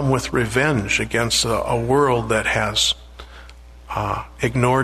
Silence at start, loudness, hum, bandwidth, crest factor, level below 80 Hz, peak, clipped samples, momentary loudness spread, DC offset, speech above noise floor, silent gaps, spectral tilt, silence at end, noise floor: 0 s; -19 LUFS; 60 Hz at -40 dBFS; 13.5 kHz; 18 dB; -38 dBFS; -4 dBFS; under 0.1%; 8 LU; under 0.1%; 22 dB; none; -4 dB/octave; 0 s; -41 dBFS